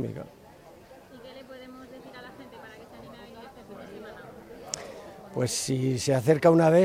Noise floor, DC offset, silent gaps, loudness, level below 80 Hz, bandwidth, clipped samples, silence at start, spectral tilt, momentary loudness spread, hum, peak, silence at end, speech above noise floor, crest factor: -51 dBFS; under 0.1%; none; -25 LUFS; -64 dBFS; 16 kHz; under 0.1%; 0 s; -5.5 dB/octave; 25 LU; none; -8 dBFS; 0 s; 28 dB; 20 dB